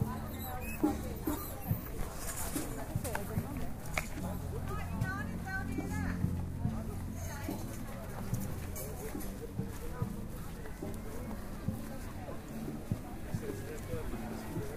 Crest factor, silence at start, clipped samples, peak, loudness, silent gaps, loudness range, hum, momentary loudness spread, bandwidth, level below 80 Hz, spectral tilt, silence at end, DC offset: 20 dB; 0 s; under 0.1%; -18 dBFS; -40 LUFS; none; 4 LU; none; 6 LU; 15.5 kHz; -46 dBFS; -6 dB/octave; 0 s; under 0.1%